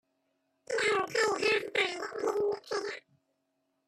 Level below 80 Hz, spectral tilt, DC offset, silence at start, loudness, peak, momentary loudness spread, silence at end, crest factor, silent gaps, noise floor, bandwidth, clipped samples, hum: -76 dBFS; -2 dB/octave; under 0.1%; 0.7 s; -31 LUFS; -16 dBFS; 8 LU; 0.9 s; 18 dB; none; -79 dBFS; 13.5 kHz; under 0.1%; none